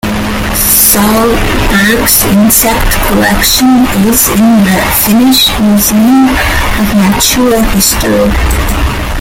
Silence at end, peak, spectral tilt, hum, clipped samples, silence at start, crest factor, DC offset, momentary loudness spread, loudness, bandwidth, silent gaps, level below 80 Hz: 0 s; 0 dBFS; -3.5 dB/octave; none; 0.6%; 0.05 s; 8 dB; under 0.1%; 6 LU; -7 LUFS; over 20 kHz; none; -18 dBFS